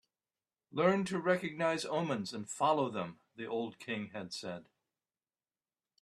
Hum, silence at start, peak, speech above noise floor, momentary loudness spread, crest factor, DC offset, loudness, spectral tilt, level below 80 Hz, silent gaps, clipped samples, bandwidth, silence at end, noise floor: none; 0.75 s; -14 dBFS; over 55 dB; 12 LU; 22 dB; under 0.1%; -35 LUFS; -5 dB/octave; -78 dBFS; none; under 0.1%; 13 kHz; 1.4 s; under -90 dBFS